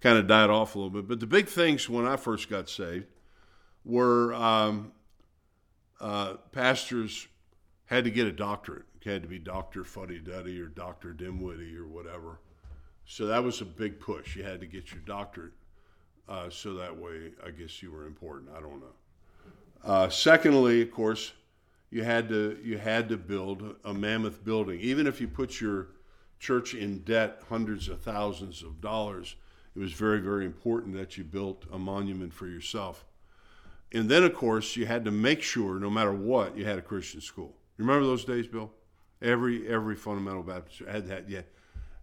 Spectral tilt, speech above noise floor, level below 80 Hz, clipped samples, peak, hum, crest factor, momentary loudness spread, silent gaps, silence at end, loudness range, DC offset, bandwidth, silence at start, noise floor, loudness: -5 dB/octave; 39 dB; -54 dBFS; under 0.1%; -4 dBFS; none; 26 dB; 19 LU; none; 0.05 s; 15 LU; under 0.1%; 17 kHz; 0 s; -68 dBFS; -29 LUFS